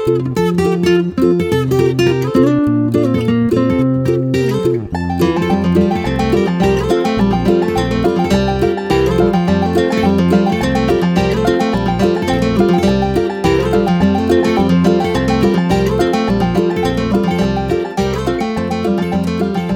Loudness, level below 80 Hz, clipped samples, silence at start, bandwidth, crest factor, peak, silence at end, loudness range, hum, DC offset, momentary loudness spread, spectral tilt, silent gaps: -14 LUFS; -30 dBFS; under 0.1%; 0 s; 16.5 kHz; 14 dB; 0 dBFS; 0 s; 1 LU; none; under 0.1%; 4 LU; -7 dB/octave; none